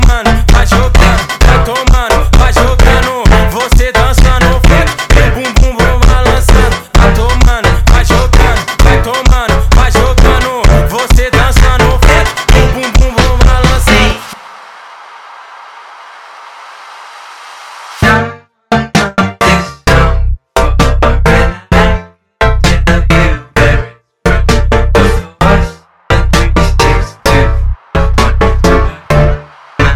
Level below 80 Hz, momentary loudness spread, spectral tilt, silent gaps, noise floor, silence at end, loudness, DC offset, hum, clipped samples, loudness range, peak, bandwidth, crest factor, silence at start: -10 dBFS; 7 LU; -5 dB/octave; none; -31 dBFS; 0 s; -9 LUFS; under 0.1%; none; 3%; 6 LU; 0 dBFS; 16 kHz; 8 dB; 0 s